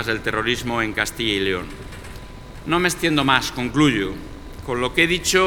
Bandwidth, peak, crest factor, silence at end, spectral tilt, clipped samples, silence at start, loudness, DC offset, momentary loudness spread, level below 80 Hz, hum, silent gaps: 19 kHz; 0 dBFS; 22 dB; 0 s; -3.5 dB/octave; under 0.1%; 0 s; -20 LUFS; under 0.1%; 19 LU; -40 dBFS; none; none